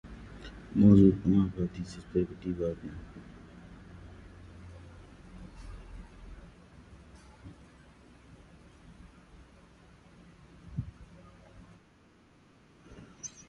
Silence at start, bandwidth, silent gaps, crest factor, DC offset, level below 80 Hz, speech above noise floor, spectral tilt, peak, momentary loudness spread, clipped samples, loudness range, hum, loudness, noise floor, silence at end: 0.05 s; 7.6 kHz; none; 24 dB; under 0.1%; -50 dBFS; 35 dB; -8.5 dB/octave; -10 dBFS; 29 LU; under 0.1%; 27 LU; none; -28 LUFS; -61 dBFS; 0.2 s